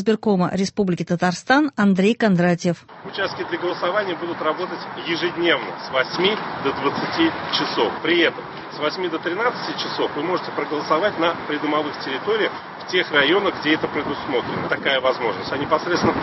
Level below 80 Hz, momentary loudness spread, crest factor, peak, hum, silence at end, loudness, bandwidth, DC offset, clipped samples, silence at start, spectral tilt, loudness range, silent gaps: -56 dBFS; 8 LU; 18 dB; -2 dBFS; none; 0 s; -21 LUFS; 8.4 kHz; under 0.1%; under 0.1%; 0 s; -5.5 dB/octave; 3 LU; none